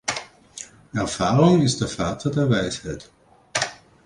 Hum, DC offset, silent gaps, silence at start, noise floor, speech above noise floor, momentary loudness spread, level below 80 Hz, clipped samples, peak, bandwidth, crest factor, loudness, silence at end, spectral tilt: none; under 0.1%; none; 0.05 s; -42 dBFS; 22 dB; 21 LU; -48 dBFS; under 0.1%; -4 dBFS; 11.5 kHz; 18 dB; -22 LUFS; 0.3 s; -5 dB/octave